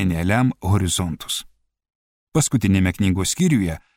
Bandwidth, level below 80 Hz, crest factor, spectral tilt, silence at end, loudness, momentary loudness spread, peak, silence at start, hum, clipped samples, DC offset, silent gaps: 16.5 kHz; -40 dBFS; 18 dB; -5 dB/octave; 0.2 s; -20 LUFS; 7 LU; -4 dBFS; 0 s; none; under 0.1%; under 0.1%; 1.95-2.27 s